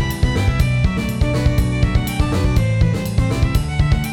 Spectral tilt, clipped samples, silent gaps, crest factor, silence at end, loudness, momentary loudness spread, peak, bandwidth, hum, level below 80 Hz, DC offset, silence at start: -6.5 dB/octave; under 0.1%; none; 12 dB; 0 s; -18 LUFS; 2 LU; -4 dBFS; 18 kHz; none; -22 dBFS; under 0.1%; 0 s